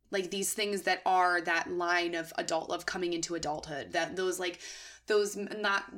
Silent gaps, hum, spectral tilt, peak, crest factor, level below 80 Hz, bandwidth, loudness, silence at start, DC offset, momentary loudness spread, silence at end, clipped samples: none; none; -2.5 dB/octave; -14 dBFS; 18 dB; -66 dBFS; 18 kHz; -31 LUFS; 0.1 s; under 0.1%; 9 LU; 0 s; under 0.1%